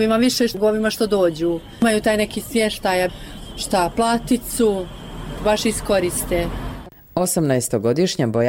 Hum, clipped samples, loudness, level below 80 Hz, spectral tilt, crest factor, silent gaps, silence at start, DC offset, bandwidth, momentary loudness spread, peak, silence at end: none; under 0.1%; -20 LUFS; -38 dBFS; -4.5 dB/octave; 12 dB; none; 0 s; under 0.1%; 17 kHz; 11 LU; -8 dBFS; 0 s